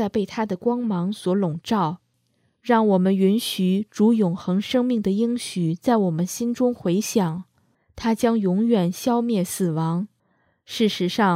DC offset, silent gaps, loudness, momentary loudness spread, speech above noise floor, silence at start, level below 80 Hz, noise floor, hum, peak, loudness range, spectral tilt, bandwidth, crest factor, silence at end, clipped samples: under 0.1%; none; -22 LUFS; 7 LU; 47 dB; 0 s; -60 dBFS; -68 dBFS; none; -6 dBFS; 2 LU; -6 dB/octave; 16 kHz; 16 dB; 0 s; under 0.1%